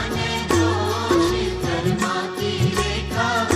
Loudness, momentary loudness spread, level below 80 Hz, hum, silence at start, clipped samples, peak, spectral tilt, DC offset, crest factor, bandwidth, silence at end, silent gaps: -21 LUFS; 4 LU; -36 dBFS; none; 0 s; under 0.1%; -6 dBFS; -5 dB/octave; under 0.1%; 16 dB; 15.5 kHz; 0 s; none